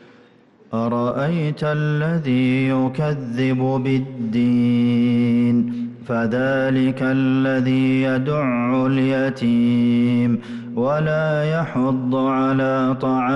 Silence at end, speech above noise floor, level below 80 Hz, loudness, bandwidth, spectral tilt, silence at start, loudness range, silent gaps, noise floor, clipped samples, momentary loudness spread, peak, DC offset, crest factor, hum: 0 s; 32 dB; -56 dBFS; -19 LUFS; 6.2 kHz; -8.5 dB/octave; 0.7 s; 2 LU; none; -51 dBFS; under 0.1%; 5 LU; -10 dBFS; under 0.1%; 8 dB; none